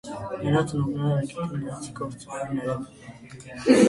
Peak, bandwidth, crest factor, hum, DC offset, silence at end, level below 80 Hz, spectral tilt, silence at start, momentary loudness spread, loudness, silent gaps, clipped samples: -4 dBFS; 11.5 kHz; 22 dB; none; under 0.1%; 0 s; -56 dBFS; -6.5 dB/octave; 0.05 s; 17 LU; -28 LUFS; none; under 0.1%